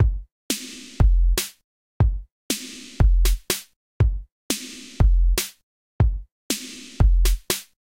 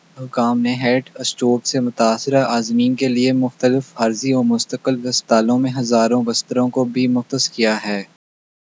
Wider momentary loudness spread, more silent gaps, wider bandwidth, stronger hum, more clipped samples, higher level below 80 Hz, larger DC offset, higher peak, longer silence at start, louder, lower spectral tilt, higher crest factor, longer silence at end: first, 16 LU vs 5 LU; first, 0.32-0.49 s, 1.64-2.00 s, 2.31-2.49 s, 3.76-4.00 s, 4.32-4.50 s, 5.63-5.99 s, 6.32-6.50 s vs none; first, 16.5 kHz vs 8 kHz; neither; neither; first, -22 dBFS vs -76 dBFS; neither; second, -4 dBFS vs 0 dBFS; second, 0 s vs 0.15 s; second, -24 LUFS vs -18 LUFS; about the same, -4 dB/octave vs -4.5 dB/octave; about the same, 16 dB vs 18 dB; second, 0.35 s vs 0.75 s